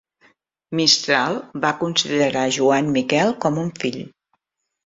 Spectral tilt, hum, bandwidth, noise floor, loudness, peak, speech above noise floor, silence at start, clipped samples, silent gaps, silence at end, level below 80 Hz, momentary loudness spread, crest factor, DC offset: -3.5 dB/octave; none; 7.8 kHz; -79 dBFS; -19 LUFS; -2 dBFS; 59 dB; 0.7 s; under 0.1%; none; 0.75 s; -62 dBFS; 11 LU; 18 dB; under 0.1%